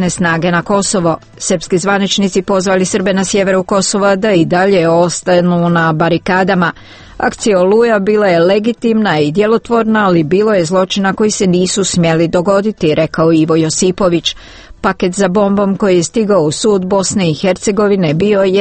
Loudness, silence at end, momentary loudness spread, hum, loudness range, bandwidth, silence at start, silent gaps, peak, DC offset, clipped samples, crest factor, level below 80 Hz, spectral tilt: -12 LUFS; 0 s; 4 LU; none; 2 LU; 8.8 kHz; 0 s; none; 0 dBFS; under 0.1%; under 0.1%; 12 dB; -42 dBFS; -5 dB/octave